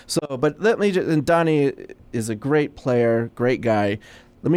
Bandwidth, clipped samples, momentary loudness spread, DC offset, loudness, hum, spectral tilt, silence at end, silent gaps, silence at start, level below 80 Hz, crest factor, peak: 15 kHz; under 0.1%; 10 LU; under 0.1%; -21 LUFS; none; -6 dB/octave; 0 s; none; 0.1 s; -52 dBFS; 14 dB; -8 dBFS